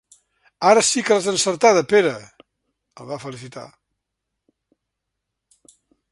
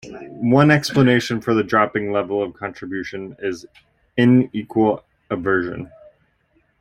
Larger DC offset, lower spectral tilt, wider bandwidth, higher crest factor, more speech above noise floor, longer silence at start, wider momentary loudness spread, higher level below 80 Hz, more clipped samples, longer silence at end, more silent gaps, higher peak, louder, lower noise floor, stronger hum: neither; second, -2.5 dB/octave vs -6.5 dB/octave; second, 11.5 kHz vs 15.5 kHz; about the same, 22 dB vs 18 dB; first, 62 dB vs 44 dB; first, 0.6 s vs 0.05 s; first, 21 LU vs 15 LU; second, -66 dBFS vs -54 dBFS; neither; first, 2.45 s vs 0.95 s; neither; about the same, 0 dBFS vs -2 dBFS; about the same, -17 LUFS vs -19 LUFS; first, -80 dBFS vs -63 dBFS; neither